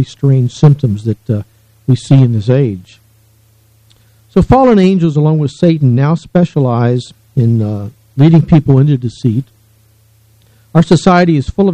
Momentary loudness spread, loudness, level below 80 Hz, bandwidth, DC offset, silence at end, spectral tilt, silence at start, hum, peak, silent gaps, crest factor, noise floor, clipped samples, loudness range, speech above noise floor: 11 LU; -11 LUFS; -36 dBFS; 9.2 kHz; under 0.1%; 0 s; -8.5 dB/octave; 0 s; none; 0 dBFS; none; 12 dB; -49 dBFS; 0.7%; 3 LU; 39 dB